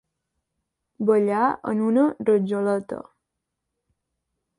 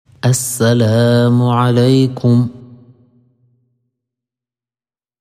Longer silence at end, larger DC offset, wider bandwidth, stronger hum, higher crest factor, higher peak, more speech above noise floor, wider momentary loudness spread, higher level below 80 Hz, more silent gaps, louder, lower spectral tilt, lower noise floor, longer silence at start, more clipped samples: second, 1.55 s vs 2.55 s; neither; second, 11 kHz vs 15.5 kHz; neither; about the same, 16 dB vs 14 dB; second, -8 dBFS vs 0 dBFS; second, 60 dB vs over 78 dB; first, 8 LU vs 4 LU; second, -68 dBFS vs -56 dBFS; neither; second, -22 LUFS vs -13 LUFS; first, -8 dB/octave vs -6 dB/octave; second, -82 dBFS vs under -90 dBFS; first, 1 s vs 0.25 s; neither